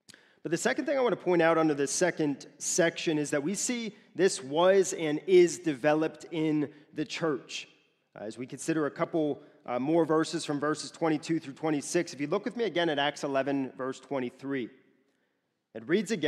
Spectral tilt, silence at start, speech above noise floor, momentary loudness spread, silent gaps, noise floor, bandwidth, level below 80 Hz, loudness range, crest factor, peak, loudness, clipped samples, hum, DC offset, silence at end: -4 dB/octave; 0.45 s; 50 dB; 13 LU; none; -78 dBFS; 13.5 kHz; -82 dBFS; 6 LU; 18 dB; -10 dBFS; -29 LUFS; under 0.1%; none; under 0.1%; 0 s